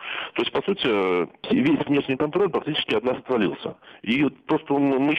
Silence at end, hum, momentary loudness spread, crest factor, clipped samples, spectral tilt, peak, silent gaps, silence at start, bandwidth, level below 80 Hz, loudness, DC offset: 0 s; none; 6 LU; 14 dB; under 0.1%; -7.5 dB/octave; -10 dBFS; none; 0 s; 6.2 kHz; -60 dBFS; -23 LUFS; under 0.1%